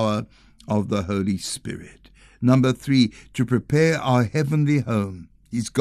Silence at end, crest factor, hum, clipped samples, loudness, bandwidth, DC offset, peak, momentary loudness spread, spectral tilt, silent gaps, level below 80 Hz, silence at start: 0 s; 18 dB; none; under 0.1%; -22 LUFS; 13 kHz; under 0.1%; -4 dBFS; 12 LU; -6.5 dB/octave; none; -52 dBFS; 0 s